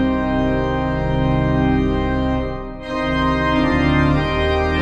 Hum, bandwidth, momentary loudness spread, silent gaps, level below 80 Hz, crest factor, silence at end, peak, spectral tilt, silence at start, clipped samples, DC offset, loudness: none; 8 kHz; 6 LU; none; -26 dBFS; 14 dB; 0 s; -4 dBFS; -8 dB/octave; 0 s; under 0.1%; under 0.1%; -18 LUFS